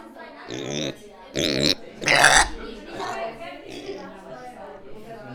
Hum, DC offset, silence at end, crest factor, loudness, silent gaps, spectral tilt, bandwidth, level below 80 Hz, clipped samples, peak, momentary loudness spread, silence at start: none; under 0.1%; 0 s; 26 dB; -21 LUFS; none; -2 dB/octave; 19.5 kHz; -44 dBFS; under 0.1%; 0 dBFS; 25 LU; 0 s